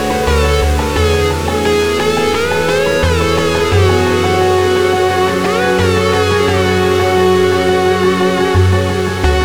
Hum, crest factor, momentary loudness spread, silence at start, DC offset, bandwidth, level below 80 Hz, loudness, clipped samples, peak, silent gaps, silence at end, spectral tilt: none; 12 dB; 2 LU; 0 s; under 0.1%; 19.5 kHz; -24 dBFS; -12 LUFS; under 0.1%; 0 dBFS; none; 0 s; -5.5 dB/octave